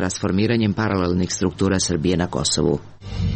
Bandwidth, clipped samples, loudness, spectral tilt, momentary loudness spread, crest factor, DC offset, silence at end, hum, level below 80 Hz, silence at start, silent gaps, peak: 8.8 kHz; under 0.1%; -21 LUFS; -5 dB/octave; 4 LU; 14 dB; 0.1%; 0 s; none; -38 dBFS; 0 s; none; -8 dBFS